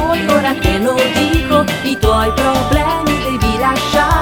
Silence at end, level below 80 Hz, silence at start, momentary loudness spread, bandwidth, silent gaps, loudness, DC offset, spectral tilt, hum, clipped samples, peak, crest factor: 0 s; -24 dBFS; 0 s; 2 LU; 19 kHz; none; -14 LUFS; under 0.1%; -5 dB/octave; none; under 0.1%; 0 dBFS; 12 dB